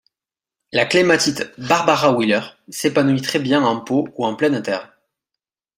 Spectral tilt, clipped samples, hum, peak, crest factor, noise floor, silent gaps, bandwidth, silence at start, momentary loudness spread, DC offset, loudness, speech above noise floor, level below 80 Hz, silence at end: -4.5 dB/octave; under 0.1%; none; -2 dBFS; 18 dB; -89 dBFS; none; 16 kHz; 0.75 s; 9 LU; under 0.1%; -18 LUFS; 71 dB; -60 dBFS; 0.9 s